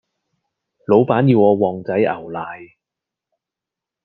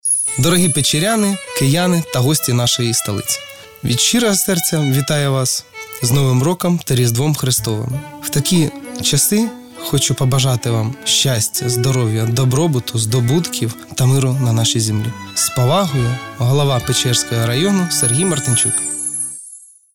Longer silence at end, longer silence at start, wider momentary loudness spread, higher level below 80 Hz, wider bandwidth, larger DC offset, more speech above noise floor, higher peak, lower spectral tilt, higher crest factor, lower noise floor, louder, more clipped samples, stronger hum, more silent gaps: first, 1.4 s vs 0.35 s; first, 0.9 s vs 0.05 s; first, 18 LU vs 7 LU; second, -64 dBFS vs -46 dBFS; second, 5.4 kHz vs 18.5 kHz; neither; first, 70 dB vs 24 dB; first, 0 dBFS vs -4 dBFS; first, -11 dB/octave vs -4 dB/octave; first, 18 dB vs 12 dB; first, -86 dBFS vs -40 dBFS; about the same, -16 LUFS vs -16 LUFS; neither; neither; neither